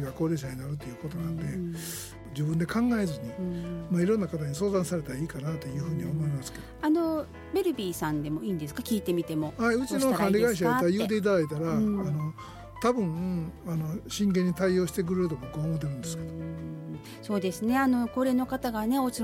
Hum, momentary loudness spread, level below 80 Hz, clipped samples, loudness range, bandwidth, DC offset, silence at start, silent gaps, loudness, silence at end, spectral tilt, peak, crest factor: none; 11 LU; -52 dBFS; under 0.1%; 4 LU; 16.5 kHz; under 0.1%; 0 s; none; -29 LUFS; 0 s; -6.5 dB/octave; -12 dBFS; 16 dB